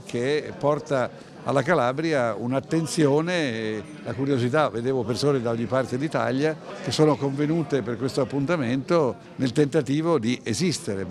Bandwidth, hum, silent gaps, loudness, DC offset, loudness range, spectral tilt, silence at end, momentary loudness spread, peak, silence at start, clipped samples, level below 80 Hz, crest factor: 13.5 kHz; none; none; -24 LUFS; under 0.1%; 1 LU; -6 dB/octave; 0 s; 7 LU; -6 dBFS; 0 s; under 0.1%; -60 dBFS; 18 dB